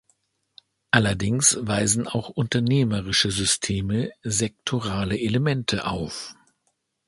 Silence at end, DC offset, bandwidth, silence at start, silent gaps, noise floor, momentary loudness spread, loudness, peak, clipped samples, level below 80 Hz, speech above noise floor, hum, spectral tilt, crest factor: 0.75 s; under 0.1%; 11.5 kHz; 0.95 s; none; -73 dBFS; 9 LU; -23 LUFS; 0 dBFS; under 0.1%; -46 dBFS; 50 dB; none; -3.5 dB/octave; 24 dB